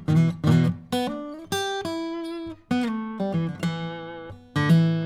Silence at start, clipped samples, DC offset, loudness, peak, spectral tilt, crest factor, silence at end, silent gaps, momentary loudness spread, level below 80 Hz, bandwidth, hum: 0 s; under 0.1%; under 0.1%; -25 LUFS; -8 dBFS; -6.5 dB/octave; 16 dB; 0 s; none; 14 LU; -58 dBFS; 14.5 kHz; none